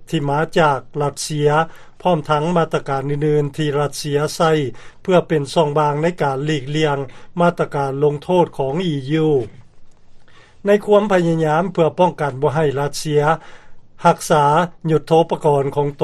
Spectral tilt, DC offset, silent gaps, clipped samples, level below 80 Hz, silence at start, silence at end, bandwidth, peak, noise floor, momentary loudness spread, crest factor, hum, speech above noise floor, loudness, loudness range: -6 dB/octave; under 0.1%; none; under 0.1%; -46 dBFS; 0 s; 0 s; 13 kHz; 0 dBFS; -40 dBFS; 6 LU; 18 dB; none; 23 dB; -18 LUFS; 2 LU